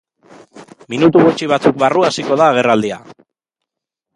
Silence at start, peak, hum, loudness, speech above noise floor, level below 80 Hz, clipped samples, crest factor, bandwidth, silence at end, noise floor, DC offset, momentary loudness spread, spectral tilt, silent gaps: 0.55 s; 0 dBFS; none; -13 LUFS; 68 dB; -58 dBFS; under 0.1%; 16 dB; 11 kHz; 1.05 s; -80 dBFS; under 0.1%; 11 LU; -5.5 dB/octave; none